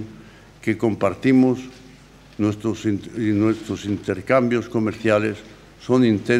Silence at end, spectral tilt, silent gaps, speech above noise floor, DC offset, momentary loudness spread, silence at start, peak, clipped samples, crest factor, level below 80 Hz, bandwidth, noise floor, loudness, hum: 0 s; -7 dB/octave; none; 27 dB; under 0.1%; 12 LU; 0 s; -4 dBFS; under 0.1%; 18 dB; -54 dBFS; 11.5 kHz; -46 dBFS; -21 LUFS; none